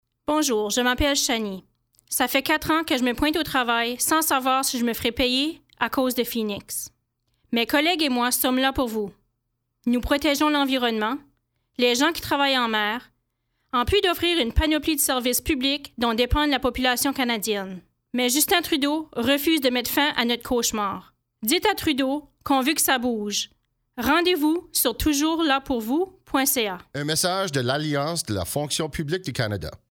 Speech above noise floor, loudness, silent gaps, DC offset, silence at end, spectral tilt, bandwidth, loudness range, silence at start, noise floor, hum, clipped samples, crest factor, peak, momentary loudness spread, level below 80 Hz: 54 dB; -23 LUFS; none; under 0.1%; 0.15 s; -3 dB/octave; over 20 kHz; 2 LU; 0.3 s; -77 dBFS; none; under 0.1%; 18 dB; -6 dBFS; 8 LU; -42 dBFS